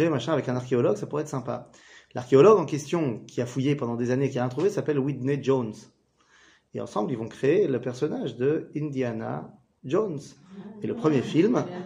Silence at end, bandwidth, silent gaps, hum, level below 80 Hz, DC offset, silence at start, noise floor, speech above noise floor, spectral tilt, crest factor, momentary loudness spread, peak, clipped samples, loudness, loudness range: 0 s; 10.5 kHz; none; none; -68 dBFS; under 0.1%; 0 s; -61 dBFS; 35 dB; -7 dB/octave; 20 dB; 14 LU; -6 dBFS; under 0.1%; -26 LUFS; 5 LU